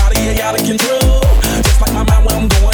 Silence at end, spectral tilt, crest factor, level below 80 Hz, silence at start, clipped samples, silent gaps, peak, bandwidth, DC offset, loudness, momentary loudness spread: 0 s; -4.5 dB/octave; 8 dB; -12 dBFS; 0 s; under 0.1%; none; -2 dBFS; over 20 kHz; under 0.1%; -13 LUFS; 3 LU